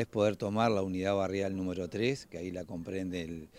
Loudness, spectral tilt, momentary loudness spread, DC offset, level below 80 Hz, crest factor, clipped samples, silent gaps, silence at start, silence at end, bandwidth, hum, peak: -33 LUFS; -6.5 dB/octave; 10 LU; under 0.1%; -64 dBFS; 18 dB; under 0.1%; none; 0 s; 0 s; 16 kHz; none; -14 dBFS